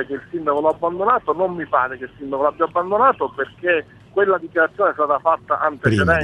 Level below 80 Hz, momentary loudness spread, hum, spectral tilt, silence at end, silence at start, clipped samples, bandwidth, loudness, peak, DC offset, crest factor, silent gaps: -48 dBFS; 8 LU; none; -7 dB/octave; 0 s; 0 s; under 0.1%; 11 kHz; -19 LUFS; -2 dBFS; under 0.1%; 18 dB; none